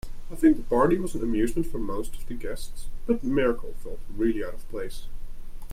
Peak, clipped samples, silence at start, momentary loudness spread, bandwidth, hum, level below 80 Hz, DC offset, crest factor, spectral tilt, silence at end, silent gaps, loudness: -8 dBFS; under 0.1%; 0.05 s; 20 LU; 14.5 kHz; none; -34 dBFS; under 0.1%; 16 dB; -6.5 dB/octave; 0 s; none; -27 LUFS